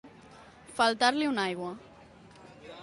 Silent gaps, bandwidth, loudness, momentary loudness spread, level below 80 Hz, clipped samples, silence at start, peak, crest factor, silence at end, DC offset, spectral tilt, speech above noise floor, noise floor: none; 11.5 kHz; -28 LUFS; 23 LU; -68 dBFS; under 0.1%; 0.05 s; -12 dBFS; 20 dB; 0 s; under 0.1%; -3.5 dB/octave; 26 dB; -54 dBFS